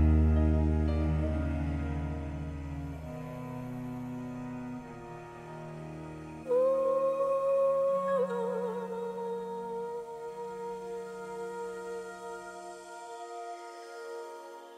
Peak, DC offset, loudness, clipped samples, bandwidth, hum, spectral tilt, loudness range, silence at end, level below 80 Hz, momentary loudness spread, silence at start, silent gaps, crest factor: -14 dBFS; under 0.1%; -33 LUFS; under 0.1%; 10 kHz; none; -8.5 dB/octave; 11 LU; 0 s; -38 dBFS; 16 LU; 0 s; none; 18 dB